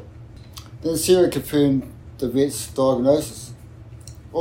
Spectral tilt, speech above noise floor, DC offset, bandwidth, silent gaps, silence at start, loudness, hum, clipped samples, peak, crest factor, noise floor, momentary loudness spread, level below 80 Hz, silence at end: -5.5 dB/octave; 21 dB; under 0.1%; 16.5 kHz; none; 0 s; -20 LUFS; none; under 0.1%; -4 dBFS; 18 dB; -41 dBFS; 23 LU; -46 dBFS; 0 s